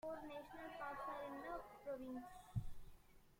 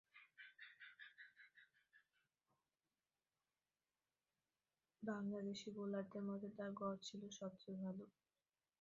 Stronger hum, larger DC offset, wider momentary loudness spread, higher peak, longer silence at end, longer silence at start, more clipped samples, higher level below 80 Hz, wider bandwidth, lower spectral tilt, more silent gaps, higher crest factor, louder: neither; neither; second, 7 LU vs 16 LU; about the same, -32 dBFS vs -32 dBFS; second, 0 s vs 0.75 s; about the same, 0.05 s vs 0.15 s; neither; first, -62 dBFS vs under -90 dBFS; first, 16.5 kHz vs 7.2 kHz; first, -7 dB/octave vs -5.5 dB/octave; neither; about the same, 20 dB vs 20 dB; about the same, -51 LUFS vs -51 LUFS